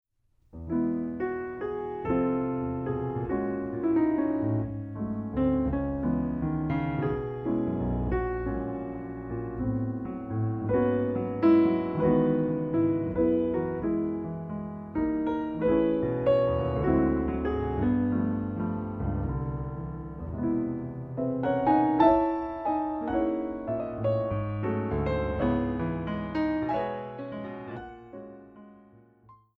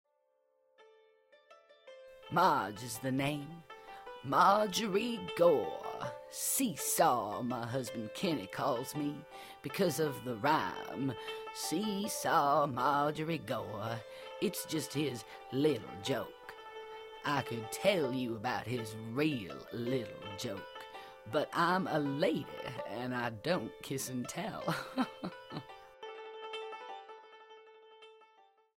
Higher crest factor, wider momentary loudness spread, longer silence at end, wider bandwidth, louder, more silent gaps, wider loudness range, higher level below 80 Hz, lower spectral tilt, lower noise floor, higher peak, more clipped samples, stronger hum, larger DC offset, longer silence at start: about the same, 20 dB vs 22 dB; second, 11 LU vs 18 LU; second, 0.25 s vs 0.55 s; second, 4.8 kHz vs 16 kHz; first, -29 LUFS vs -35 LUFS; neither; about the same, 5 LU vs 7 LU; first, -44 dBFS vs -70 dBFS; first, -11 dB/octave vs -4.5 dB/octave; second, -66 dBFS vs -76 dBFS; first, -8 dBFS vs -14 dBFS; neither; neither; neither; second, 0.55 s vs 0.8 s